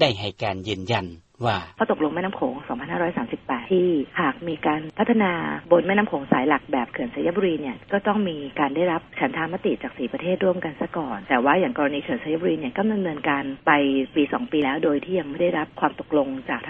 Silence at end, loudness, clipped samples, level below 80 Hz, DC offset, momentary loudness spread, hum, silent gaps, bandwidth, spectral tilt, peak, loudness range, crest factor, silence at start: 0 s; -24 LUFS; under 0.1%; -56 dBFS; under 0.1%; 8 LU; none; none; 7.8 kHz; -7 dB/octave; -4 dBFS; 3 LU; 20 dB; 0 s